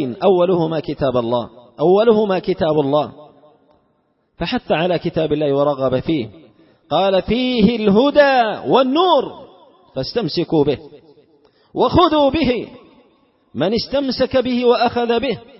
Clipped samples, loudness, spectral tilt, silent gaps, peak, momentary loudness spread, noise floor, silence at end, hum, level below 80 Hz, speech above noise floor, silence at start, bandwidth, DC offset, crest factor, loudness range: under 0.1%; -17 LUFS; -9.5 dB/octave; none; 0 dBFS; 10 LU; -63 dBFS; 0.2 s; none; -44 dBFS; 47 dB; 0 s; 5.8 kHz; under 0.1%; 16 dB; 5 LU